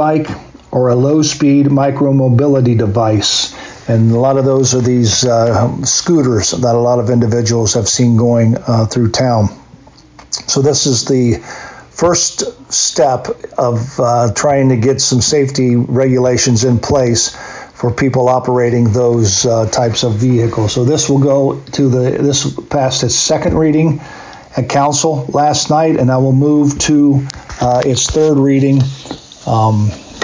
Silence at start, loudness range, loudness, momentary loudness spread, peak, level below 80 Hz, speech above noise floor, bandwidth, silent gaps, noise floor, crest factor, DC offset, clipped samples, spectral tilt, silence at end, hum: 0 s; 2 LU; -12 LUFS; 8 LU; -2 dBFS; -38 dBFS; 29 dB; 7.8 kHz; none; -40 dBFS; 10 dB; under 0.1%; under 0.1%; -5 dB/octave; 0 s; none